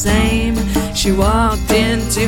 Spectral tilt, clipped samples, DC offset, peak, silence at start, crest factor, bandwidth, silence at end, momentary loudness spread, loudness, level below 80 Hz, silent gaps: -4.5 dB/octave; under 0.1%; under 0.1%; 0 dBFS; 0 s; 14 dB; 17 kHz; 0 s; 3 LU; -15 LUFS; -20 dBFS; none